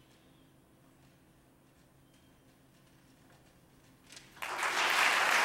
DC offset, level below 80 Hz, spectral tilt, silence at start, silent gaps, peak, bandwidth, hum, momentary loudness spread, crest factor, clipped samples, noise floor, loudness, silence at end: under 0.1%; -74 dBFS; 0 dB/octave; 4.1 s; none; -12 dBFS; 16 kHz; none; 27 LU; 24 dB; under 0.1%; -64 dBFS; -29 LUFS; 0 s